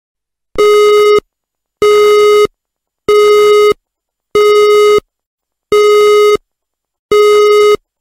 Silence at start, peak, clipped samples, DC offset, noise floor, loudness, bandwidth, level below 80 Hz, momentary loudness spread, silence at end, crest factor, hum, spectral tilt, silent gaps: 0.55 s; -2 dBFS; under 0.1%; under 0.1%; -76 dBFS; -8 LUFS; 16 kHz; -46 dBFS; 7 LU; 0.25 s; 8 dB; none; -2.5 dB/octave; 5.27-5.38 s, 6.99-7.09 s